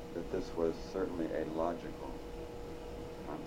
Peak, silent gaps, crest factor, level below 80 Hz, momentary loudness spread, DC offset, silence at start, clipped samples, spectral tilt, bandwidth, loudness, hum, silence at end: -20 dBFS; none; 20 dB; -52 dBFS; 10 LU; under 0.1%; 0 s; under 0.1%; -6.5 dB/octave; 16 kHz; -40 LUFS; none; 0 s